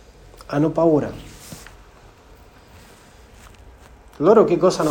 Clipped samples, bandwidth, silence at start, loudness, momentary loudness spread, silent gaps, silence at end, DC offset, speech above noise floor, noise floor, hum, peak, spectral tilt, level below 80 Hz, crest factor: under 0.1%; 17 kHz; 0.5 s; -18 LUFS; 24 LU; none; 0 s; under 0.1%; 31 dB; -47 dBFS; none; -2 dBFS; -6.5 dB/octave; -48 dBFS; 20 dB